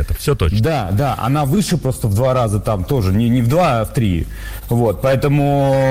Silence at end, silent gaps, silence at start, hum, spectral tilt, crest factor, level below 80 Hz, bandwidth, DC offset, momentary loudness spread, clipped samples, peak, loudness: 0 s; none; 0 s; none; -7 dB/octave; 10 dB; -30 dBFS; 16.5 kHz; under 0.1%; 5 LU; under 0.1%; -6 dBFS; -16 LUFS